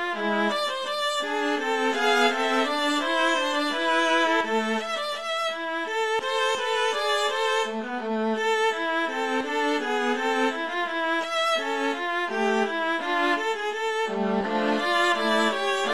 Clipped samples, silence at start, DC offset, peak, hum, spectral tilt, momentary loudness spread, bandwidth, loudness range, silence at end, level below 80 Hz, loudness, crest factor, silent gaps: under 0.1%; 0 s; 0.3%; -8 dBFS; none; -2.5 dB/octave; 5 LU; 14 kHz; 2 LU; 0 s; -72 dBFS; -24 LUFS; 16 dB; none